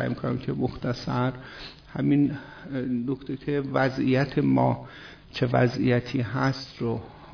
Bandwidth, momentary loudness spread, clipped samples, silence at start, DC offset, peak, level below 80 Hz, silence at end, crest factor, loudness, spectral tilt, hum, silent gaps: 5.4 kHz; 15 LU; under 0.1%; 0 s; under 0.1%; -10 dBFS; -52 dBFS; 0 s; 18 dB; -26 LUFS; -8 dB/octave; none; none